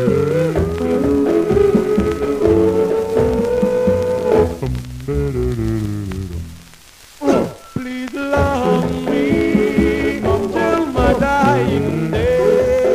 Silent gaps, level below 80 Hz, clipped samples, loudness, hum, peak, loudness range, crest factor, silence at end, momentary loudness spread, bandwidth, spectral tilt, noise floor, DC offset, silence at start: none; -32 dBFS; under 0.1%; -17 LUFS; none; -2 dBFS; 6 LU; 14 dB; 0 s; 10 LU; 15.5 kHz; -7 dB/octave; -42 dBFS; 0.2%; 0 s